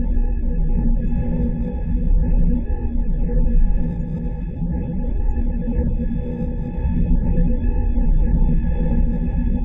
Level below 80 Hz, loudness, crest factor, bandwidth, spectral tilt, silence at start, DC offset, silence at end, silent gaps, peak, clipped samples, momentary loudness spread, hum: -18 dBFS; -23 LUFS; 12 dB; 2.8 kHz; -12.5 dB/octave; 0 s; under 0.1%; 0 s; none; -6 dBFS; under 0.1%; 5 LU; none